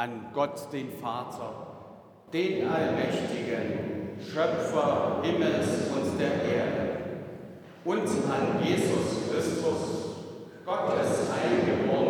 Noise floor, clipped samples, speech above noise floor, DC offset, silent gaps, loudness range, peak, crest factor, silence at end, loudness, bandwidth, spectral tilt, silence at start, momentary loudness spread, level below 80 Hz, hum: -49 dBFS; under 0.1%; 21 dB; under 0.1%; none; 3 LU; -14 dBFS; 16 dB; 0 s; -29 LUFS; 19.5 kHz; -5.5 dB/octave; 0 s; 12 LU; -64 dBFS; none